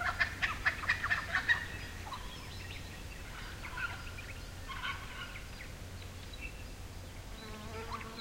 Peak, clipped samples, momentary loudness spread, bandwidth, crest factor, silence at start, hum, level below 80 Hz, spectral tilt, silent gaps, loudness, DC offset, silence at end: -16 dBFS; under 0.1%; 15 LU; 16.5 kHz; 24 dB; 0 s; none; -50 dBFS; -3 dB/octave; none; -38 LUFS; under 0.1%; 0 s